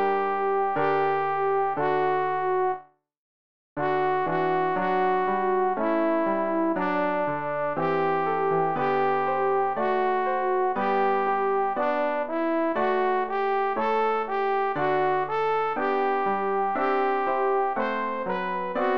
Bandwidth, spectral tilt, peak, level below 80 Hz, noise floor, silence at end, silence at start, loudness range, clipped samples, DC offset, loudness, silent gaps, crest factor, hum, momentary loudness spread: 5.8 kHz; -8 dB/octave; -10 dBFS; -64 dBFS; under -90 dBFS; 0 s; 0 s; 2 LU; under 0.1%; 0.7%; -25 LUFS; 3.17-3.76 s; 14 dB; none; 3 LU